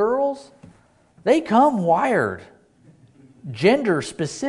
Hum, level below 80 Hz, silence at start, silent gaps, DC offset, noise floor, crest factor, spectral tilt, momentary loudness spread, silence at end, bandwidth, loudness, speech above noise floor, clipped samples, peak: none; -60 dBFS; 0 s; none; under 0.1%; -55 dBFS; 18 dB; -6 dB/octave; 19 LU; 0 s; 11 kHz; -20 LUFS; 36 dB; under 0.1%; -4 dBFS